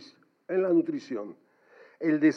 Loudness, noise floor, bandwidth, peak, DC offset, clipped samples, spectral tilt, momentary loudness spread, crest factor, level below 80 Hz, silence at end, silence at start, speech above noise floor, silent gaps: -28 LUFS; -57 dBFS; 6.4 kHz; -12 dBFS; under 0.1%; under 0.1%; -7.5 dB/octave; 13 LU; 18 dB; under -90 dBFS; 0 s; 0 s; 31 dB; none